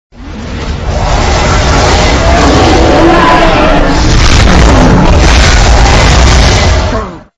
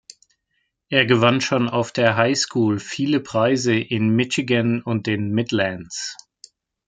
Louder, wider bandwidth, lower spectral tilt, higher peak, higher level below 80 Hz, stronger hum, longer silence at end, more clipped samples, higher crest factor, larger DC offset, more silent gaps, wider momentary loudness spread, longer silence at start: first, -6 LUFS vs -20 LUFS; first, 11 kHz vs 9.4 kHz; about the same, -5 dB/octave vs -5 dB/octave; about the same, 0 dBFS vs -2 dBFS; first, -10 dBFS vs -62 dBFS; neither; second, 0.15 s vs 0.75 s; first, 6% vs under 0.1%; second, 6 dB vs 18 dB; neither; neither; first, 10 LU vs 7 LU; second, 0.2 s vs 0.9 s